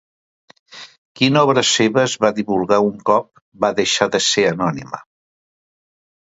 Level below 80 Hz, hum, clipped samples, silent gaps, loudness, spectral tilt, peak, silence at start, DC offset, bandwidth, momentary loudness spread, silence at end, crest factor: -58 dBFS; none; under 0.1%; 0.98-1.15 s, 3.42-3.52 s; -16 LUFS; -3.5 dB/octave; 0 dBFS; 0.75 s; under 0.1%; 8 kHz; 18 LU; 1.25 s; 18 dB